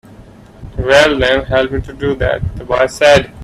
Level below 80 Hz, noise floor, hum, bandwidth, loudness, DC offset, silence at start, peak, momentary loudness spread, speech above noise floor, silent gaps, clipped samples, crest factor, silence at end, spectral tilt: -30 dBFS; -38 dBFS; none; 13.5 kHz; -13 LUFS; under 0.1%; 0.2 s; 0 dBFS; 11 LU; 26 dB; none; under 0.1%; 14 dB; 0 s; -4.5 dB/octave